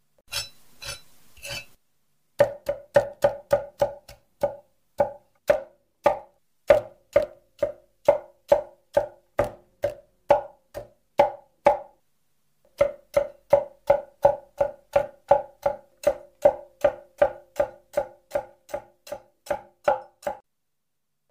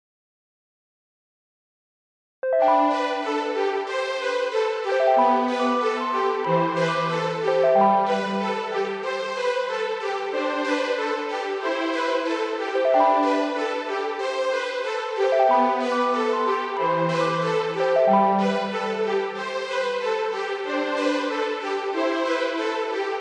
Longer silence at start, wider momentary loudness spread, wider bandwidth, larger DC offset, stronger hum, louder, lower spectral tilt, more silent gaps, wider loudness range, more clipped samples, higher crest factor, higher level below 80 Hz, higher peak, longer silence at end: second, 0.3 s vs 2.45 s; first, 14 LU vs 8 LU; first, 16 kHz vs 10.5 kHz; neither; neither; second, -26 LUFS vs -23 LUFS; about the same, -4.5 dB/octave vs -5 dB/octave; neither; about the same, 4 LU vs 4 LU; neither; first, 24 dB vs 16 dB; first, -54 dBFS vs -78 dBFS; first, -2 dBFS vs -6 dBFS; first, 0.95 s vs 0 s